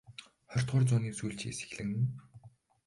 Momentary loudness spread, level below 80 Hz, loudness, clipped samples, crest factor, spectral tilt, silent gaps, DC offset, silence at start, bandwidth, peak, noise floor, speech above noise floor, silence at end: 20 LU; -62 dBFS; -34 LUFS; under 0.1%; 16 dB; -6 dB/octave; none; under 0.1%; 0.1 s; 11.5 kHz; -18 dBFS; -58 dBFS; 26 dB; 0.4 s